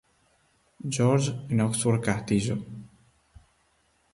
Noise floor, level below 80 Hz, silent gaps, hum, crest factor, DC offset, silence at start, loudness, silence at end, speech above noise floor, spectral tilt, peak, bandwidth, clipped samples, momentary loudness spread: -68 dBFS; -56 dBFS; none; none; 18 dB; under 0.1%; 0.85 s; -26 LUFS; 1.25 s; 43 dB; -5.5 dB/octave; -10 dBFS; 11.5 kHz; under 0.1%; 14 LU